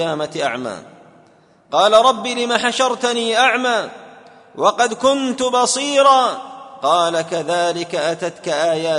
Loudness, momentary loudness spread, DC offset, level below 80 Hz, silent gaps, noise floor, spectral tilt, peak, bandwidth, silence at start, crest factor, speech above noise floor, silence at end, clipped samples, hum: -17 LUFS; 10 LU; under 0.1%; -64 dBFS; none; -51 dBFS; -2.5 dB/octave; 0 dBFS; 11 kHz; 0 s; 16 dB; 34 dB; 0 s; under 0.1%; none